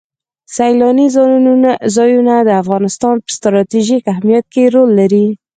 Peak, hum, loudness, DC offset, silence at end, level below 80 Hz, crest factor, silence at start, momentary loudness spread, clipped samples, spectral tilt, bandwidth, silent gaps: 0 dBFS; none; -11 LUFS; under 0.1%; 0.2 s; -56 dBFS; 10 dB; 0.5 s; 6 LU; under 0.1%; -6 dB/octave; 9.4 kHz; none